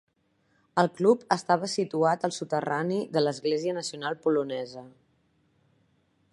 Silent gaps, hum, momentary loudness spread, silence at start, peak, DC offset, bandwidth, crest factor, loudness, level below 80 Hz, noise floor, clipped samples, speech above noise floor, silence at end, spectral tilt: none; none; 9 LU; 0.75 s; -6 dBFS; under 0.1%; 11.5 kHz; 24 dB; -27 LUFS; -76 dBFS; -70 dBFS; under 0.1%; 43 dB; 1.45 s; -5 dB/octave